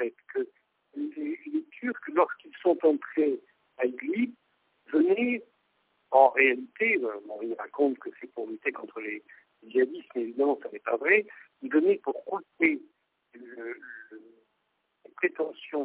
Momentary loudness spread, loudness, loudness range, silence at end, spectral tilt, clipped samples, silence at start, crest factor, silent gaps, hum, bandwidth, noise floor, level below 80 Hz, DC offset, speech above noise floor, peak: 16 LU; -28 LUFS; 6 LU; 0 s; -8 dB/octave; under 0.1%; 0 s; 22 dB; none; none; 4 kHz; -77 dBFS; -80 dBFS; under 0.1%; 49 dB; -6 dBFS